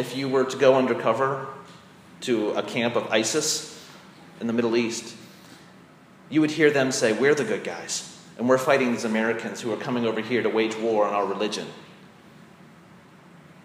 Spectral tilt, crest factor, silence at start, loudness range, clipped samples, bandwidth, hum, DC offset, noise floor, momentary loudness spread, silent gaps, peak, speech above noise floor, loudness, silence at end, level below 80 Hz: -4 dB/octave; 22 dB; 0 s; 4 LU; under 0.1%; 15.5 kHz; none; under 0.1%; -51 dBFS; 14 LU; none; -4 dBFS; 27 dB; -24 LUFS; 1.6 s; -74 dBFS